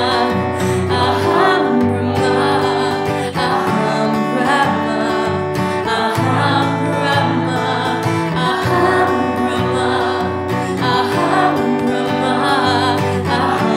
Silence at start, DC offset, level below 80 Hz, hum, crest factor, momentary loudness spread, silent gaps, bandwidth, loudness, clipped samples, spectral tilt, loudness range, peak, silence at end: 0 s; under 0.1%; -48 dBFS; none; 14 dB; 4 LU; none; 16 kHz; -16 LUFS; under 0.1%; -5.5 dB/octave; 1 LU; -2 dBFS; 0 s